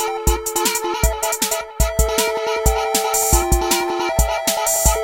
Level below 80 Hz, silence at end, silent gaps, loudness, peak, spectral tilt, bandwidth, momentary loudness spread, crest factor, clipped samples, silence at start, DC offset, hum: -24 dBFS; 0 s; none; -18 LUFS; -2 dBFS; -3 dB/octave; 17 kHz; 4 LU; 18 dB; under 0.1%; 0 s; under 0.1%; none